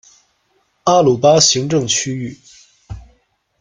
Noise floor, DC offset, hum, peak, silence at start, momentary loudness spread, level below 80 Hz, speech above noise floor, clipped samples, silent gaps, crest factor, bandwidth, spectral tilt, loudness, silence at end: -62 dBFS; under 0.1%; none; 0 dBFS; 0.85 s; 25 LU; -46 dBFS; 49 dB; under 0.1%; none; 16 dB; 10.5 kHz; -3.5 dB/octave; -14 LUFS; 0.6 s